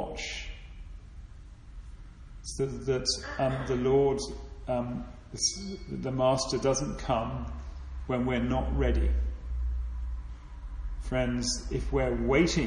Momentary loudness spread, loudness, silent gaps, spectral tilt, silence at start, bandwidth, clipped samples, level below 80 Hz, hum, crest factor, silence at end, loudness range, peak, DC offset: 22 LU; -30 LUFS; none; -5 dB/octave; 0 s; 11 kHz; under 0.1%; -36 dBFS; none; 18 dB; 0 s; 3 LU; -12 dBFS; under 0.1%